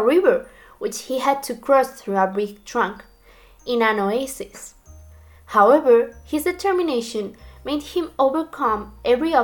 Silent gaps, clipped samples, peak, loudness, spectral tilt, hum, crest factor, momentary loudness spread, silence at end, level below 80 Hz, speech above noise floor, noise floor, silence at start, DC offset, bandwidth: none; under 0.1%; -2 dBFS; -21 LUFS; -4.5 dB/octave; none; 18 dB; 14 LU; 0 s; -50 dBFS; 30 dB; -50 dBFS; 0 s; under 0.1%; 19 kHz